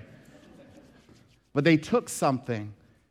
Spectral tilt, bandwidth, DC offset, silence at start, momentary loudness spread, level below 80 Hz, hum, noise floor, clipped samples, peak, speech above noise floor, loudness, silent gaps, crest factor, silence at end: -5.5 dB/octave; 16 kHz; under 0.1%; 1.55 s; 12 LU; -64 dBFS; none; -58 dBFS; under 0.1%; -8 dBFS; 33 dB; -26 LUFS; none; 22 dB; 0.4 s